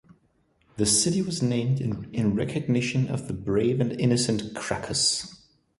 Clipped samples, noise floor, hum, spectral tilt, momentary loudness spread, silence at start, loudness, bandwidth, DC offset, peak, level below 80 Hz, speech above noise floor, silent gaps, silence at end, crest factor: under 0.1%; -66 dBFS; none; -4.5 dB/octave; 9 LU; 0.75 s; -25 LUFS; 11.5 kHz; under 0.1%; -10 dBFS; -52 dBFS; 41 dB; none; 0.45 s; 16 dB